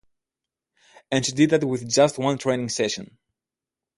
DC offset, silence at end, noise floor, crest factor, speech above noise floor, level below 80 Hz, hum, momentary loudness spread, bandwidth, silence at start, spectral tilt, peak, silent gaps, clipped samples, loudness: under 0.1%; 0.95 s; -89 dBFS; 20 dB; 67 dB; -62 dBFS; none; 7 LU; 11.5 kHz; 1.1 s; -4.5 dB/octave; -6 dBFS; none; under 0.1%; -22 LUFS